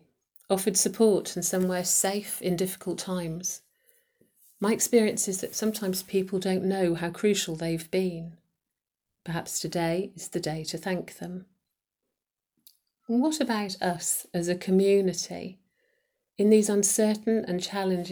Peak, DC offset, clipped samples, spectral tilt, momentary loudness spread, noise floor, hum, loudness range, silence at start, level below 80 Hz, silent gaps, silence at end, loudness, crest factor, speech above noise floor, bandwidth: -10 dBFS; under 0.1%; under 0.1%; -4 dB/octave; 11 LU; -87 dBFS; none; 7 LU; 0.5 s; -66 dBFS; none; 0 s; -27 LUFS; 18 dB; 61 dB; over 20 kHz